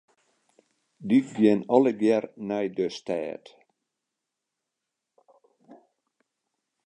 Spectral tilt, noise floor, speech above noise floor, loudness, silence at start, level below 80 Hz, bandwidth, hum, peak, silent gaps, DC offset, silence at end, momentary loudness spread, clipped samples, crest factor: -7 dB/octave; -85 dBFS; 61 dB; -25 LUFS; 1 s; -74 dBFS; 9.2 kHz; none; -4 dBFS; none; under 0.1%; 1.1 s; 13 LU; under 0.1%; 24 dB